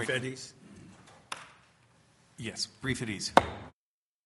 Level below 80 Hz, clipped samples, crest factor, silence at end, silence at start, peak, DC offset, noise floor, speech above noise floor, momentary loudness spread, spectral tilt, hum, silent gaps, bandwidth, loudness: -60 dBFS; under 0.1%; 34 dB; 0.55 s; 0 s; -2 dBFS; under 0.1%; under -90 dBFS; over 59 dB; 27 LU; -3.5 dB/octave; none; none; 11.5 kHz; -32 LUFS